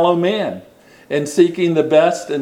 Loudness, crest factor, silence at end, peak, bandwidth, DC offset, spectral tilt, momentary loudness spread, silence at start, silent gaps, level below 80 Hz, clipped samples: -16 LUFS; 16 dB; 0 s; 0 dBFS; 13.5 kHz; under 0.1%; -5.5 dB/octave; 10 LU; 0 s; none; -64 dBFS; under 0.1%